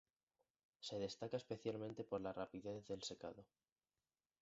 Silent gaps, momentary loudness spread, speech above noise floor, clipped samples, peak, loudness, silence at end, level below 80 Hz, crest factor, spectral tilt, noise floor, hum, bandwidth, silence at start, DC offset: none; 8 LU; over 41 dB; under 0.1%; -30 dBFS; -49 LUFS; 0.95 s; -78 dBFS; 20 dB; -5 dB/octave; under -90 dBFS; none; 7.6 kHz; 0.8 s; under 0.1%